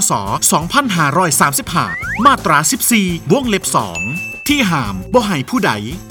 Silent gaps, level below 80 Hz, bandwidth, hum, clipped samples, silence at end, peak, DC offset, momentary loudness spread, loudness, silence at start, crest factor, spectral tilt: none; -38 dBFS; over 20 kHz; none; under 0.1%; 0 s; 0 dBFS; under 0.1%; 7 LU; -14 LUFS; 0 s; 14 dB; -3.5 dB/octave